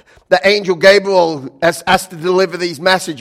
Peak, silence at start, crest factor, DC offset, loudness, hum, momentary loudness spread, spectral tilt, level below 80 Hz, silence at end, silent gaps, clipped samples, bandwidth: 0 dBFS; 0.3 s; 14 dB; under 0.1%; -13 LUFS; none; 7 LU; -4 dB/octave; -48 dBFS; 0 s; none; 0.6%; 16 kHz